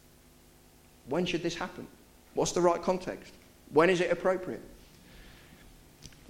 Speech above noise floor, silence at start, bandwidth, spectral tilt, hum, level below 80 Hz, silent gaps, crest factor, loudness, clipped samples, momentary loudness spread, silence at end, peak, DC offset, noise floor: 29 dB; 1.05 s; 16.5 kHz; -4.5 dB/octave; none; -58 dBFS; none; 22 dB; -30 LUFS; under 0.1%; 21 LU; 0.2 s; -10 dBFS; under 0.1%; -58 dBFS